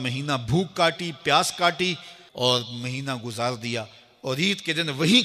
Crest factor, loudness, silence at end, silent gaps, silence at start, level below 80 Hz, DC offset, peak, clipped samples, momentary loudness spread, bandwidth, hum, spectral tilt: 20 dB; -24 LUFS; 0 s; none; 0 s; -58 dBFS; under 0.1%; -4 dBFS; under 0.1%; 10 LU; 15.5 kHz; none; -4 dB/octave